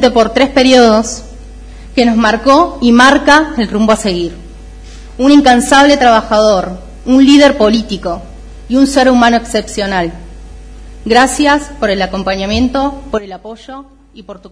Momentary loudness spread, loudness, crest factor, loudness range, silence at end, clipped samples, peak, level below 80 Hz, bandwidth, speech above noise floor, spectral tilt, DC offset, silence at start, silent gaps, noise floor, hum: 15 LU; -9 LUFS; 10 dB; 5 LU; 0.05 s; 1%; 0 dBFS; -30 dBFS; 11 kHz; 21 dB; -4 dB/octave; under 0.1%; 0 s; none; -30 dBFS; none